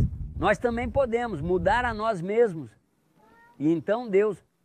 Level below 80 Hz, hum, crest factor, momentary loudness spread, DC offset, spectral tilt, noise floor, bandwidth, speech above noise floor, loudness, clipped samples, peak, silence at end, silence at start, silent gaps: -42 dBFS; none; 16 dB; 5 LU; under 0.1%; -7 dB/octave; -63 dBFS; 10 kHz; 38 dB; -26 LUFS; under 0.1%; -10 dBFS; 0.3 s; 0 s; none